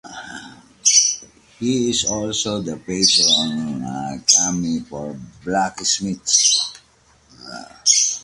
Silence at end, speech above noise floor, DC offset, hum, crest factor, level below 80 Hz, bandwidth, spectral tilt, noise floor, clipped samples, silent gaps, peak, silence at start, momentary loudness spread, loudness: 0 s; 35 dB; under 0.1%; none; 20 dB; -54 dBFS; 11.5 kHz; -1.5 dB/octave; -55 dBFS; under 0.1%; none; 0 dBFS; 0.05 s; 20 LU; -17 LUFS